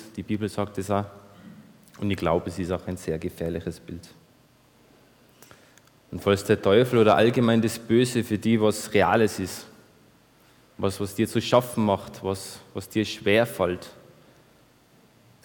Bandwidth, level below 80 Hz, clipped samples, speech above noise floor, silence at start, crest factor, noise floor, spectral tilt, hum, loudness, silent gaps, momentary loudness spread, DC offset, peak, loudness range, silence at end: 19.5 kHz; -56 dBFS; under 0.1%; 34 dB; 0 s; 20 dB; -58 dBFS; -5.5 dB/octave; none; -24 LUFS; none; 15 LU; under 0.1%; -6 dBFS; 10 LU; 1.55 s